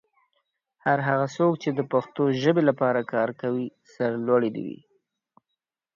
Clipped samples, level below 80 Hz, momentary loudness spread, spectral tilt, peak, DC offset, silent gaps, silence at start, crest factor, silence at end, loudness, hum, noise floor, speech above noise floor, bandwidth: under 0.1%; -72 dBFS; 9 LU; -7.5 dB/octave; -6 dBFS; under 0.1%; none; 0.85 s; 20 dB; 1.25 s; -25 LUFS; none; -84 dBFS; 60 dB; 7.2 kHz